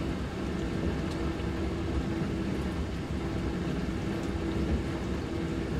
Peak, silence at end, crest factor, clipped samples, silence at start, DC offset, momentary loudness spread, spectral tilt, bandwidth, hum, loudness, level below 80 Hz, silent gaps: -18 dBFS; 0 s; 14 dB; under 0.1%; 0 s; under 0.1%; 2 LU; -7 dB/octave; 13.5 kHz; none; -33 LUFS; -38 dBFS; none